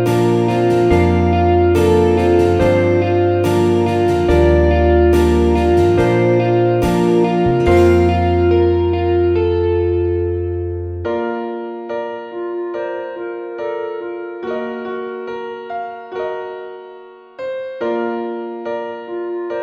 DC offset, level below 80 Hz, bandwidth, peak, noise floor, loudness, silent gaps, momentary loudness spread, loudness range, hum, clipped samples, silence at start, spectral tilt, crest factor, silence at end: under 0.1%; -28 dBFS; 14 kHz; -2 dBFS; -38 dBFS; -16 LUFS; none; 13 LU; 12 LU; none; under 0.1%; 0 s; -8 dB/octave; 14 dB; 0 s